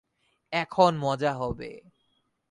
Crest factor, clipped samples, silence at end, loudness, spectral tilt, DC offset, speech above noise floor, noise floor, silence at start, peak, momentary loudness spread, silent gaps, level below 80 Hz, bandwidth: 22 dB; under 0.1%; 0.7 s; -26 LUFS; -6 dB/octave; under 0.1%; 47 dB; -73 dBFS; 0.5 s; -6 dBFS; 14 LU; none; -56 dBFS; 11 kHz